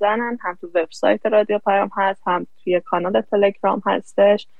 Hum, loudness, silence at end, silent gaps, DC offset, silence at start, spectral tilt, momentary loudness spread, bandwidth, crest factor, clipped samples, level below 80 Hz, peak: none; -20 LUFS; 0.15 s; none; 0.8%; 0 s; -6 dB/octave; 7 LU; 9 kHz; 16 dB; under 0.1%; -70 dBFS; -4 dBFS